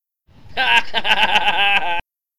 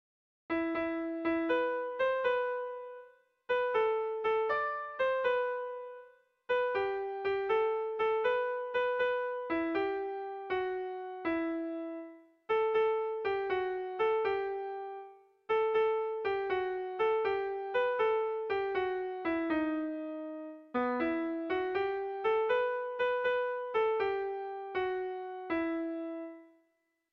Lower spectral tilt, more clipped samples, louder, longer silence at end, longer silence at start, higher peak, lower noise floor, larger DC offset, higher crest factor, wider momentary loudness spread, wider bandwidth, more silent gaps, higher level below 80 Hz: second, -1.5 dB/octave vs -6 dB/octave; neither; first, -16 LUFS vs -33 LUFS; second, 0 s vs 0.65 s; second, 0 s vs 0.5 s; first, -2 dBFS vs -20 dBFS; second, -47 dBFS vs -78 dBFS; neither; about the same, 18 dB vs 14 dB; about the same, 10 LU vs 10 LU; first, 15 kHz vs 6 kHz; neither; first, -46 dBFS vs -70 dBFS